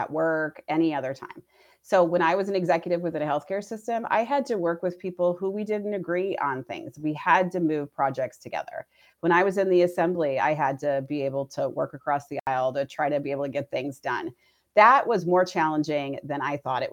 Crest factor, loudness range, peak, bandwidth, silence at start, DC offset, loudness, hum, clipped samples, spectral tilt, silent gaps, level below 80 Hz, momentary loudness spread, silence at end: 22 dB; 4 LU; -4 dBFS; 15.5 kHz; 0 s; under 0.1%; -25 LUFS; none; under 0.1%; -6.5 dB/octave; 12.41-12.46 s; -74 dBFS; 10 LU; 0 s